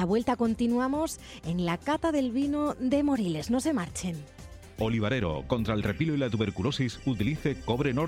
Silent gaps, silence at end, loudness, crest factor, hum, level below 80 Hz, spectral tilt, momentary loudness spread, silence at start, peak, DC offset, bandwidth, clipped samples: none; 0 s; -29 LUFS; 16 dB; none; -48 dBFS; -6 dB/octave; 7 LU; 0 s; -14 dBFS; under 0.1%; 16 kHz; under 0.1%